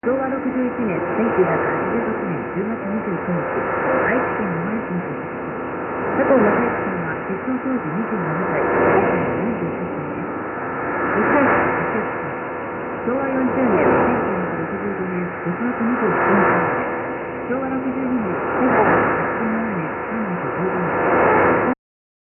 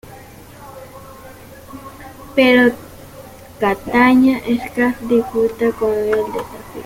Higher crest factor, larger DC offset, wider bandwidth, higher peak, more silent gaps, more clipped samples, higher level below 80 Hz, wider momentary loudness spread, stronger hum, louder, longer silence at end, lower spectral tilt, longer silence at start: about the same, 16 dB vs 16 dB; neither; second, 3.2 kHz vs 16.5 kHz; about the same, -4 dBFS vs -2 dBFS; neither; neither; about the same, -48 dBFS vs -46 dBFS; second, 10 LU vs 26 LU; neither; second, -20 LUFS vs -16 LUFS; first, 0.55 s vs 0 s; first, -12.5 dB/octave vs -5.5 dB/octave; about the same, 0.05 s vs 0.05 s